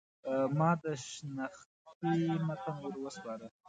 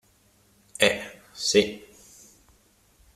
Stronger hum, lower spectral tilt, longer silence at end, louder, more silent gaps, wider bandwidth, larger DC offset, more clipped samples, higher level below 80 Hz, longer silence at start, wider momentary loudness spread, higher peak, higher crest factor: neither; first, -6.5 dB/octave vs -2.5 dB/octave; second, 0.2 s vs 1.35 s; second, -36 LUFS vs -24 LUFS; first, 1.66-1.85 s, 1.95-2.01 s vs none; second, 9.4 kHz vs 15 kHz; neither; neither; second, -76 dBFS vs -60 dBFS; second, 0.25 s vs 0.8 s; second, 12 LU vs 21 LU; second, -16 dBFS vs -4 dBFS; second, 20 dB vs 26 dB